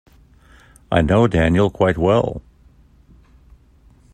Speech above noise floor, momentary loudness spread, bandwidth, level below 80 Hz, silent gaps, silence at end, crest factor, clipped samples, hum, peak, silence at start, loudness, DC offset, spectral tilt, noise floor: 35 dB; 8 LU; 9.8 kHz; -38 dBFS; none; 1.75 s; 18 dB; under 0.1%; none; -2 dBFS; 0.9 s; -17 LUFS; under 0.1%; -7.5 dB/octave; -51 dBFS